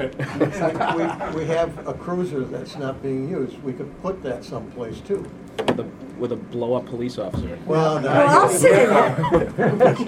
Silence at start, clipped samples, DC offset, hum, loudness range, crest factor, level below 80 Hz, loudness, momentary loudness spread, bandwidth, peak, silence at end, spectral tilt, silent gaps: 0 s; under 0.1%; under 0.1%; none; 11 LU; 20 dB; -46 dBFS; -21 LUFS; 16 LU; 16.5 kHz; 0 dBFS; 0 s; -5.5 dB/octave; none